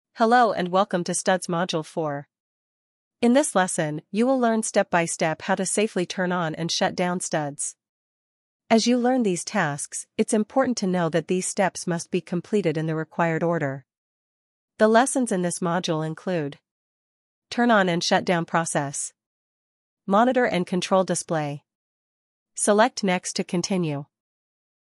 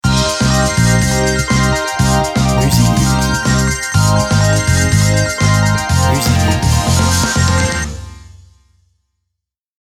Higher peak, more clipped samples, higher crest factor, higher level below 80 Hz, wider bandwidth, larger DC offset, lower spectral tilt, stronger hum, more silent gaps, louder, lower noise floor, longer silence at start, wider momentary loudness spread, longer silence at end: second, -4 dBFS vs 0 dBFS; neither; first, 20 dB vs 14 dB; second, -74 dBFS vs -24 dBFS; second, 13.5 kHz vs 18.5 kHz; neither; about the same, -4.5 dB/octave vs -4.5 dB/octave; neither; first, 2.40-3.11 s, 7.89-8.60 s, 13.98-14.68 s, 16.71-17.42 s, 19.26-19.97 s, 21.75-22.46 s vs none; second, -23 LUFS vs -13 LUFS; first, under -90 dBFS vs -77 dBFS; about the same, 0.15 s vs 0.05 s; first, 10 LU vs 3 LU; second, 0.85 s vs 1.55 s